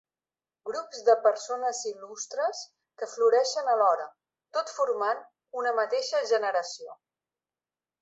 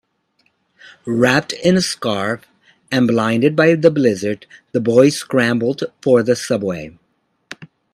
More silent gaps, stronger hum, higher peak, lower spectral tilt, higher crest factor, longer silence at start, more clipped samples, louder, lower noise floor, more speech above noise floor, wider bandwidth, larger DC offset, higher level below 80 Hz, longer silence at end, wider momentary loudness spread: neither; neither; second, -8 dBFS vs 0 dBFS; second, 0 dB/octave vs -5.5 dB/octave; about the same, 20 dB vs 18 dB; second, 0.65 s vs 1.05 s; neither; second, -28 LUFS vs -16 LUFS; first, under -90 dBFS vs -64 dBFS; first, over 63 dB vs 48 dB; second, 8 kHz vs 14.5 kHz; neither; second, -84 dBFS vs -56 dBFS; first, 1.05 s vs 0.3 s; about the same, 16 LU vs 16 LU